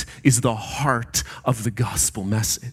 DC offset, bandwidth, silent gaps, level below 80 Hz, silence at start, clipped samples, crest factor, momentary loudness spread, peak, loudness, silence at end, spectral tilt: under 0.1%; 16.5 kHz; none; -42 dBFS; 0 s; under 0.1%; 20 dB; 5 LU; -2 dBFS; -22 LUFS; 0 s; -4 dB/octave